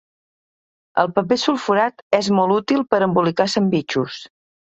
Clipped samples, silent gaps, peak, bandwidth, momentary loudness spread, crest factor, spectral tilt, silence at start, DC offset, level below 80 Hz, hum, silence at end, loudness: under 0.1%; 2.02-2.10 s; 0 dBFS; 8.4 kHz; 7 LU; 20 dB; -5.5 dB/octave; 0.95 s; under 0.1%; -62 dBFS; none; 0.4 s; -19 LUFS